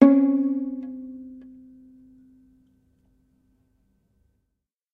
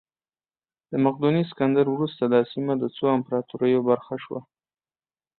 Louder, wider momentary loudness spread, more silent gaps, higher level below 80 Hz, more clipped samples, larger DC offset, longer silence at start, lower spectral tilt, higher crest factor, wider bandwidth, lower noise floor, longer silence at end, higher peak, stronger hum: about the same, -23 LUFS vs -24 LUFS; first, 28 LU vs 10 LU; neither; about the same, -68 dBFS vs -68 dBFS; neither; neither; second, 0 s vs 0.9 s; second, -9 dB/octave vs -11.5 dB/octave; first, 26 dB vs 18 dB; second, 2.8 kHz vs 4.4 kHz; second, -80 dBFS vs under -90 dBFS; first, 3.55 s vs 0.95 s; first, 0 dBFS vs -6 dBFS; neither